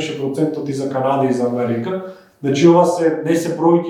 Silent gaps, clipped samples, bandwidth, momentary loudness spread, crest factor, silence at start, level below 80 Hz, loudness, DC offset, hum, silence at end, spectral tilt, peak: none; under 0.1%; 13.5 kHz; 12 LU; 16 dB; 0 s; -66 dBFS; -17 LUFS; under 0.1%; none; 0 s; -6.5 dB/octave; 0 dBFS